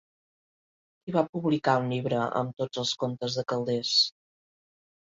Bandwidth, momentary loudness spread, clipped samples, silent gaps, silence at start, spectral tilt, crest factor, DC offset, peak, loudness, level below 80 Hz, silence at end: 7.8 kHz; 7 LU; under 0.1%; 1.29-1.33 s; 1.05 s; -4.5 dB/octave; 20 dB; under 0.1%; -10 dBFS; -27 LUFS; -70 dBFS; 0.95 s